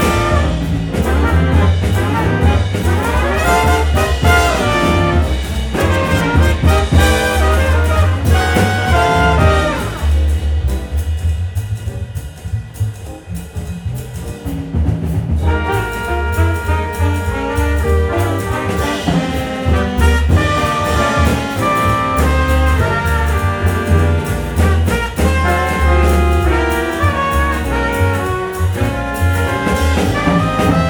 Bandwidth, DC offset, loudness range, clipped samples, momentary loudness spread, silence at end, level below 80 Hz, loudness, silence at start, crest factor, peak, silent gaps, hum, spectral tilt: 19.5 kHz; under 0.1%; 7 LU; under 0.1%; 8 LU; 0 s; -18 dBFS; -15 LUFS; 0 s; 14 dB; 0 dBFS; none; none; -6 dB/octave